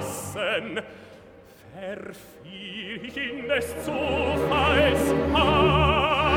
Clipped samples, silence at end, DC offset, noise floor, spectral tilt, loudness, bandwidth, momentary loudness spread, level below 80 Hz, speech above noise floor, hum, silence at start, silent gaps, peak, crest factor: under 0.1%; 0 s; under 0.1%; -49 dBFS; -5 dB/octave; -23 LUFS; 18 kHz; 19 LU; -38 dBFS; 25 dB; none; 0 s; none; -8 dBFS; 18 dB